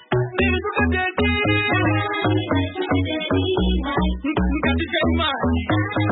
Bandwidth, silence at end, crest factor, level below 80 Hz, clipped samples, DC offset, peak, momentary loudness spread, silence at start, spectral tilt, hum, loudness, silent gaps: 4.1 kHz; 0 s; 12 dB; -30 dBFS; under 0.1%; under 0.1%; -8 dBFS; 4 LU; 0.1 s; -11.5 dB/octave; none; -21 LUFS; none